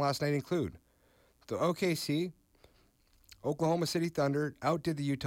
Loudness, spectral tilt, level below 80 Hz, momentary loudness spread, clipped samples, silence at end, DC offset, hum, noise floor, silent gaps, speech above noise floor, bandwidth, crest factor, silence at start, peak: -33 LUFS; -6 dB/octave; -66 dBFS; 8 LU; under 0.1%; 0 s; under 0.1%; none; -67 dBFS; none; 35 dB; 16.5 kHz; 14 dB; 0 s; -20 dBFS